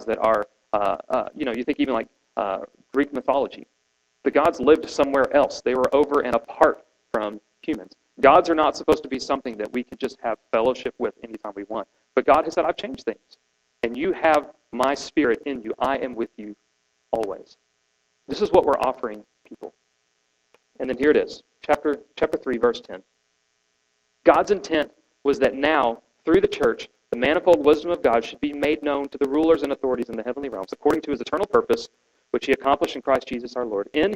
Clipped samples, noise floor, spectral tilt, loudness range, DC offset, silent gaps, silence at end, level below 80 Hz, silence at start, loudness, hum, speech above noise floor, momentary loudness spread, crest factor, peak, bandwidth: under 0.1%; -70 dBFS; -5 dB/octave; 5 LU; under 0.1%; none; 0 s; -54 dBFS; 0 s; -23 LUFS; none; 48 dB; 13 LU; 22 dB; 0 dBFS; 14 kHz